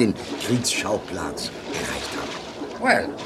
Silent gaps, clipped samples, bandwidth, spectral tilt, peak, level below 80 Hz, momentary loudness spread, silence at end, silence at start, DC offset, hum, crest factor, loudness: none; under 0.1%; 16 kHz; -3.5 dB/octave; -4 dBFS; -50 dBFS; 10 LU; 0 s; 0 s; under 0.1%; none; 20 dB; -25 LUFS